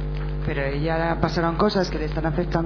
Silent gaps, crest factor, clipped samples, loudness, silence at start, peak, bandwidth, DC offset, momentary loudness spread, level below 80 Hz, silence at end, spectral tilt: none; 18 dB; under 0.1%; -24 LUFS; 0 s; -4 dBFS; 5.4 kHz; under 0.1%; 6 LU; -30 dBFS; 0 s; -7 dB/octave